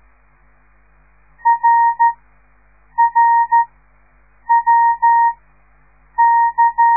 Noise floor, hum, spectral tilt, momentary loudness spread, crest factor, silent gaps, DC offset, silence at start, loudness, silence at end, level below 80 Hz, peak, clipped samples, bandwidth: -53 dBFS; 50 Hz at -55 dBFS; -6.5 dB/octave; 12 LU; 12 dB; none; 0.2%; 1.45 s; -14 LUFS; 0 s; -54 dBFS; -4 dBFS; under 0.1%; 2.4 kHz